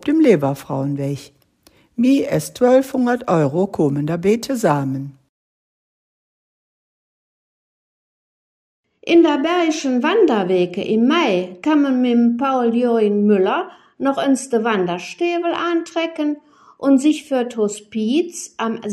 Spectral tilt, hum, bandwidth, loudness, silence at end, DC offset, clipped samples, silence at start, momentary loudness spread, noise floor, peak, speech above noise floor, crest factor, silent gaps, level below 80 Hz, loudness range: -6 dB/octave; none; 15.5 kHz; -18 LUFS; 0 s; under 0.1%; under 0.1%; 0.05 s; 9 LU; -55 dBFS; -2 dBFS; 38 dB; 18 dB; 5.29-8.84 s; -62 dBFS; 6 LU